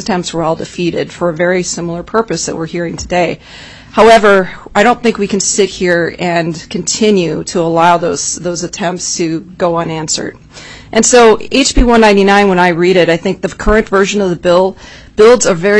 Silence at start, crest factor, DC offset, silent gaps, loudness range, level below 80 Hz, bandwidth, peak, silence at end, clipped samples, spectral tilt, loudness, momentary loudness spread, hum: 0 s; 12 dB; under 0.1%; none; 6 LU; -28 dBFS; 11 kHz; 0 dBFS; 0 s; 0.2%; -4 dB/octave; -11 LUFS; 11 LU; none